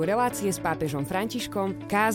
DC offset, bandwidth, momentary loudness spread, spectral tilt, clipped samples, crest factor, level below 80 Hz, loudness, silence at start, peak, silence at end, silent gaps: under 0.1%; 17 kHz; 5 LU; -4.5 dB/octave; under 0.1%; 16 dB; -54 dBFS; -28 LUFS; 0 s; -10 dBFS; 0 s; none